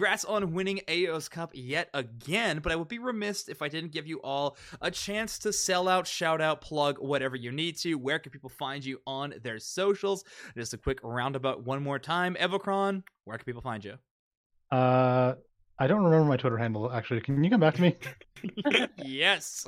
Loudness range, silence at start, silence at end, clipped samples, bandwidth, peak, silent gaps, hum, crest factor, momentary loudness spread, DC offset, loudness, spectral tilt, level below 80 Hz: 6 LU; 0 s; 0 s; under 0.1%; 16 kHz; -8 dBFS; 14.11-14.31 s, 14.37-14.50 s; none; 22 dB; 14 LU; under 0.1%; -29 LUFS; -4.5 dB/octave; -56 dBFS